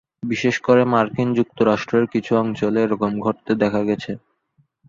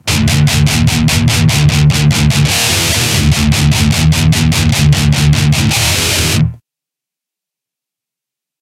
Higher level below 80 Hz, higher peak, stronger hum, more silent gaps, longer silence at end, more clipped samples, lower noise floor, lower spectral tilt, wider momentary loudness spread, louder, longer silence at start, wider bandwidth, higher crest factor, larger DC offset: second, -56 dBFS vs -22 dBFS; about the same, -2 dBFS vs 0 dBFS; neither; neither; second, 0.7 s vs 2.05 s; neither; second, -63 dBFS vs -84 dBFS; first, -7 dB/octave vs -4 dB/octave; first, 7 LU vs 1 LU; second, -20 LUFS vs -10 LUFS; first, 0.25 s vs 0.05 s; second, 7.4 kHz vs 16.5 kHz; first, 18 dB vs 12 dB; neither